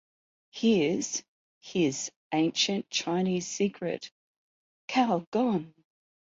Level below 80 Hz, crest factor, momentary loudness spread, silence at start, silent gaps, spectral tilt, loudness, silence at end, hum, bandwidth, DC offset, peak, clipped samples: -72 dBFS; 18 dB; 11 LU; 0.55 s; 1.28-1.61 s, 2.16-2.30 s, 4.12-4.88 s, 5.27-5.32 s; -4 dB/octave; -29 LUFS; 0.65 s; none; 7.8 kHz; under 0.1%; -12 dBFS; under 0.1%